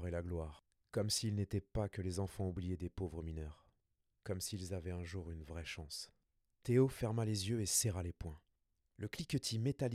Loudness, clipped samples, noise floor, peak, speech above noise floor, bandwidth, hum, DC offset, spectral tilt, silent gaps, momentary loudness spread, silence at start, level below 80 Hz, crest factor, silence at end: -40 LUFS; under 0.1%; -84 dBFS; -22 dBFS; 44 dB; 16 kHz; none; under 0.1%; -5 dB/octave; none; 15 LU; 0 s; -58 dBFS; 20 dB; 0 s